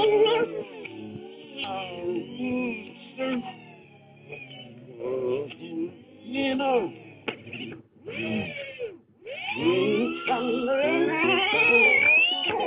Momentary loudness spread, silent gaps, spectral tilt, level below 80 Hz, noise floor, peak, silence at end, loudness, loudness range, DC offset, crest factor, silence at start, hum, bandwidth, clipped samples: 22 LU; none; -7.5 dB/octave; -66 dBFS; -51 dBFS; -8 dBFS; 0 s; -24 LUFS; 12 LU; under 0.1%; 18 dB; 0 s; none; 5.2 kHz; under 0.1%